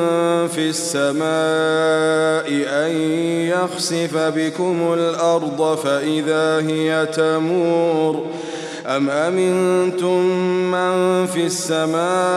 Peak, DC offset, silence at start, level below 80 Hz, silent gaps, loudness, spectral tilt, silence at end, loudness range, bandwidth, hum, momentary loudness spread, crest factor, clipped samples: -6 dBFS; under 0.1%; 0 s; -68 dBFS; none; -18 LUFS; -4.5 dB/octave; 0 s; 1 LU; 14 kHz; none; 3 LU; 12 dB; under 0.1%